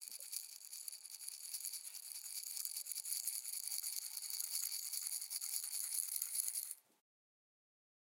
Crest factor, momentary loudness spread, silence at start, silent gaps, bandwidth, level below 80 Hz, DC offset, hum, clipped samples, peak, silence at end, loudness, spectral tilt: 28 dB; 9 LU; 0 s; none; 17 kHz; under -90 dBFS; under 0.1%; none; under 0.1%; -18 dBFS; 1.2 s; -42 LUFS; 6.5 dB/octave